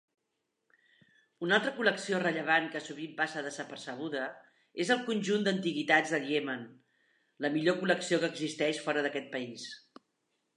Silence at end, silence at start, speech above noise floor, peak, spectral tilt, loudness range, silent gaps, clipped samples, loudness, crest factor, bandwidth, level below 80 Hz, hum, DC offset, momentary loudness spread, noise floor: 0.8 s; 1.4 s; 51 dB; -12 dBFS; -4 dB/octave; 2 LU; none; under 0.1%; -32 LUFS; 22 dB; 11 kHz; -84 dBFS; none; under 0.1%; 14 LU; -83 dBFS